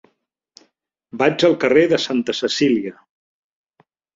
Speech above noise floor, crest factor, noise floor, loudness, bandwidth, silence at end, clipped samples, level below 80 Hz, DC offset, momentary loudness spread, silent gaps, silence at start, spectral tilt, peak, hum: 52 dB; 18 dB; -69 dBFS; -17 LUFS; 7.8 kHz; 1.25 s; under 0.1%; -60 dBFS; under 0.1%; 8 LU; none; 1.15 s; -4.5 dB/octave; -2 dBFS; none